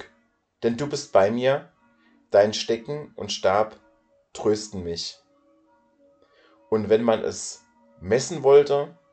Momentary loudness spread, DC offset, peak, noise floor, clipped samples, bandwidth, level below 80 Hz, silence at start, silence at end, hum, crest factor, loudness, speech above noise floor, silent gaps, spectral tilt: 16 LU; under 0.1%; -4 dBFS; -66 dBFS; under 0.1%; 9 kHz; -62 dBFS; 0 s; 0.2 s; none; 20 dB; -23 LUFS; 44 dB; none; -4.5 dB/octave